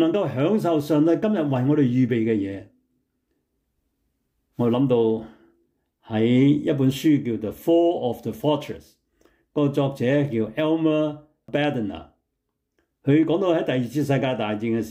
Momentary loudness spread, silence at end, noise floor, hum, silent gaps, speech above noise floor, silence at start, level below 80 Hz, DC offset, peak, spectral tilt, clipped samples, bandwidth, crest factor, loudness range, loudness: 10 LU; 0 s; -78 dBFS; none; none; 57 dB; 0 s; -62 dBFS; under 0.1%; -8 dBFS; -7.5 dB/octave; under 0.1%; 16 kHz; 14 dB; 4 LU; -22 LUFS